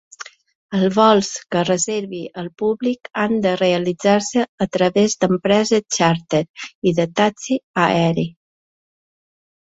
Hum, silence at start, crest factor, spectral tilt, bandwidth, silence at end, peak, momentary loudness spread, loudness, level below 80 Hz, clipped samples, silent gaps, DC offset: none; 0.2 s; 18 dB; -4.5 dB/octave; 8 kHz; 1.35 s; -2 dBFS; 9 LU; -18 LUFS; -58 dBFS; under 0.1%; 0.55-0.69 s, 4.49-4.58 s, 6.50-6.54 s, 6.75-6.82 s, 7.63-7.74 s; under 0.1%